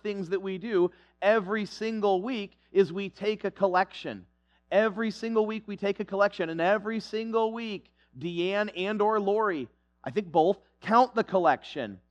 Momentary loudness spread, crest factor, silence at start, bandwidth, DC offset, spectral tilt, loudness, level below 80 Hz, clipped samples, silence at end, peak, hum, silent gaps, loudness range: 11 LU; 20 dB; 0.05 s; 9 kHz; under 0.1%; -6.5 dB/octave; -28 LUFS; -68 dBFS; under 0.1%; 0.15 s; -8 dBFS; none; none; 3 LU